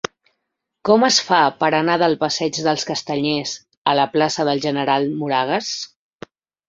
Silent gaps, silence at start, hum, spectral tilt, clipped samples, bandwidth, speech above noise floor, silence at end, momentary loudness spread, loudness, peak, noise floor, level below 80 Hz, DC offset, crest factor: 3.77-3.85 s; 0.85 s; none; -3.5 dB/octave; under 0.1%; 8 kHz; 59 dB; 0.85 s; 11 LU; -19 LUFS; -2 dBFS; -77 dBFS; -62 dBFS; under 0.1%; 18 dB